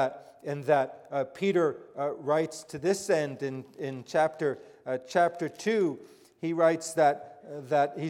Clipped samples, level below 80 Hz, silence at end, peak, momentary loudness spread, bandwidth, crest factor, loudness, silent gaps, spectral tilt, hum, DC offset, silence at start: under 0.1%; -76 dBFS; 0 s; -12 dBFS; 12 LU; 15.5 kHz; 18 dB; -29 LUFS; none; -5.5 dB/octave; none; under 0.1%; 0 s